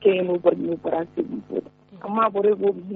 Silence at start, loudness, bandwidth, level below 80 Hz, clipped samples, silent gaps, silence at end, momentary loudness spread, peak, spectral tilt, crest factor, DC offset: 0 s; -23 LUFS; 4 kHz; -68 dBFS; under 0.1%; none; 0 s; 11 LU; -4 dBFS; -5.5 dB/octave; 18 dB; under 0.1%